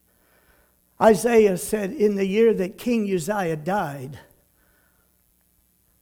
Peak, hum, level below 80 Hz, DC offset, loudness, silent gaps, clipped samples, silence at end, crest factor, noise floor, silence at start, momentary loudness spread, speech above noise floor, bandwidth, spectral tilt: -4 dBFS; none; -56 dBFS; under 0.1%; -21 LUFS; none; under 0.1%; 1.8 s; 20 dB; -64 dBFS; 1 s; 9 LU; 43 dB; 18.5 kHz; -5.5 dB/octave